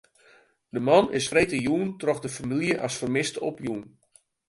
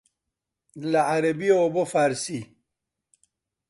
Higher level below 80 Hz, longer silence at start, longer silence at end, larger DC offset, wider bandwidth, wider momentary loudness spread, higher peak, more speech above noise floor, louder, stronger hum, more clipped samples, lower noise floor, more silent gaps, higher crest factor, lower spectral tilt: first, -58 dBFS vs -70 dBFS; about the same, 0.75 s vs 0.75 s; second, 0.6 s vs 1.25 s; neither; about the same, 11.5 kHz vs 11.5 kHz; about the same, 12 LU vs 12 LU; about the same, -6 dBFS vs -8 dBFS; second, 34 dB vs 62 dB; about the same, -25 LUFS vs -23 LUFS; neither; neither; second, -59 dBFS vs -85 dBFS; neither; about the same, 22 dB vs 18 dB; about the same, -4.5 dB/octave vs -5 dB/octave